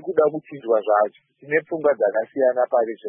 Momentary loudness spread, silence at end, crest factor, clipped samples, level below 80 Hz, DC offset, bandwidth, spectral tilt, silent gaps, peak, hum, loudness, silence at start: 5 LU; 0 s; 16 dB; under 0.1%; -72 dBFS; under 0.1%; 3.6 kHz; -10.5 dB/octave; none; -6 dBFS; none; -21 LUFS; 0.05 s